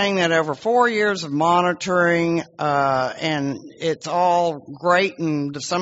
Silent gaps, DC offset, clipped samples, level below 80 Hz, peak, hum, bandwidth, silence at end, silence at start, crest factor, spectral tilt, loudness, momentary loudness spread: none; under 0.1%; under 0.1%; -62 dBFS; -4 dBFS; none; 8 kHz; 0 s; 0 s; 16 dB; -3.5 dB/octave; -20 LUFS; 7 LU